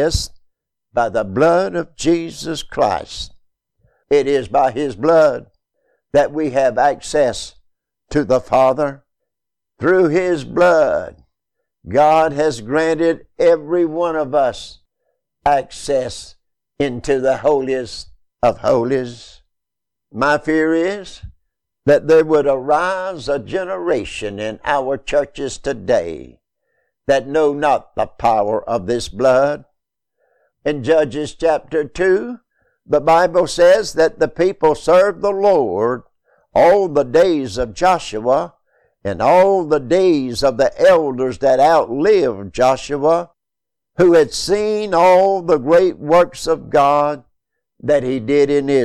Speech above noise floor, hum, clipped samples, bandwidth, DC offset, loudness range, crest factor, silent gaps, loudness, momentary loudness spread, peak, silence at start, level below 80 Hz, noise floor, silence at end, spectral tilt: 70 dB; none; under 0.1%; 13 kHz; under 0.1%; 5 LU; 14 dB; none; -16 LUFS; 11 LU; -2 dBFS; 0 s; -42 dBFS; -85 dBFS; 0 s; -5 dB/octave